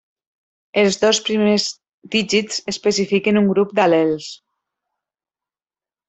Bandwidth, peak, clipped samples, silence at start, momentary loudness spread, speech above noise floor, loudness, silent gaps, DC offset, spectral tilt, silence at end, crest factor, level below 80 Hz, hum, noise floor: 8.4 kHz; -2 dBFS; under 0.1%; 0.75 s; 8 LU; over 73 dB; -18 LUFS; 1.94-2.02 s; under 0.1%; -4 dB/octave; 1.75 s; 18 dB; -62 dBFS; none; under -90 dBFS